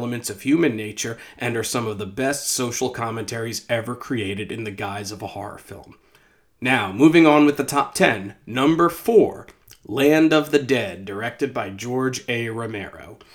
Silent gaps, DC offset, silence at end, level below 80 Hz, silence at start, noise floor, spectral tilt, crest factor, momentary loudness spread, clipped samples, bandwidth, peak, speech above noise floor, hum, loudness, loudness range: none; under 0.1%; 0.2 s; -58 dBFS; 0 s; -57 dBFS; -4.5 dB/octave; 22 dB; 14 LU; under 0.1%; 19.5 kHz; 0 dBFS; 36 dB; none; -21 LUFS; 9 LU